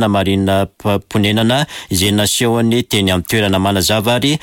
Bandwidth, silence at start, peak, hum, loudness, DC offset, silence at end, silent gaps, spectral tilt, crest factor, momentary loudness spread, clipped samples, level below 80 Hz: 17 kHz; 0 s; -4 dBFS; none; -14 LUFS; under 0.1%; 0.05 s; none; -4.5 dB/octave; 10 dB; 4 LU; under 0.1%; -42 dBFS